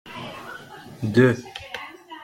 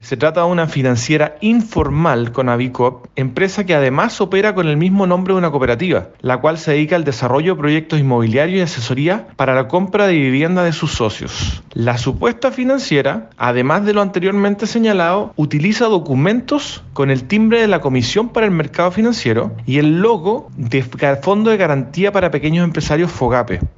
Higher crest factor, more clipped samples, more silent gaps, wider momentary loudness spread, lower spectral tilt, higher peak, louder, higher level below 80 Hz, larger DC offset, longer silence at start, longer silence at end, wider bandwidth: first, 22 dB vs 14 dB; neither; neither; first, 21 LU vs 5 LU; about the same, -7 dB/octave vs -6.5 dB/octave; second, -4 dBFS vs 0 dBFS; second, -21 LUFS vs -15 LUFS; second, -58 dBFS vs -38 dBFS; neither; about the same, 0.05 s vs 0 s; about the same, 0 s vs 0.05 s; first, 16 kHz vs 8 kHz